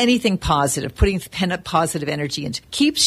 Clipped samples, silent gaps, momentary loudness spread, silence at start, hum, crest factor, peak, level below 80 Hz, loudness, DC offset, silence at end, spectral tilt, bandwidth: under 0.1%; none; 6 LU; 0 s; none; 16 dB; -2 dBFS; -32 dBFS; -21 LUFS; under 0.1%; 0 s; -4 dB/octave; 15 kHz